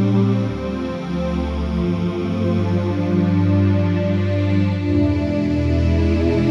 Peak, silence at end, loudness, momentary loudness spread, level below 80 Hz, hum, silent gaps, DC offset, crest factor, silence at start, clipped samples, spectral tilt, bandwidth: -6 dBFS; 0 s; -19 LUFS; 6 LU; -30 dBFS; none; none; under 0.1%; 12 dB; 0 s; under 0.1%; -9 dB/octave; 7 kHz